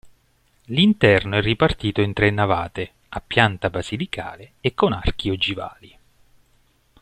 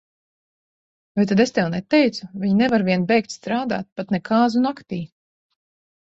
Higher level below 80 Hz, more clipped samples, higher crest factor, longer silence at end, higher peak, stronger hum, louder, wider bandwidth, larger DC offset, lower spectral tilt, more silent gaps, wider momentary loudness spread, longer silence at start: first, -38 dBFS vs -60 dBFS; neither; about the same, 20 dB vs 16 dB; first, 1.15 s vs 0.95 s; about the same, -2 dBFS vs -4 dBFS; neither; about the same, -21 LUFS vs -20 LUFS; first, 10 kHz vs 8 kHz; neither; about the same, -6.5 dB/octave vs -6.5 dB/octave; second, none vs 3.92-3.96 s; first, 15 LU vs 11 LU; second, 0.05 s vs 1.15 s